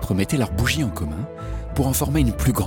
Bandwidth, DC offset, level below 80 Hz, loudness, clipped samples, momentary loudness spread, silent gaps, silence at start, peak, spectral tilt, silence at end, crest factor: 17.5 kHz; under 0.1%; -30 dBFS; -22 LUFS; under 0.1%; 10 LU; none; 0 s; -6 dBFS; -5.5 dB/octave; 0 s; 16 dB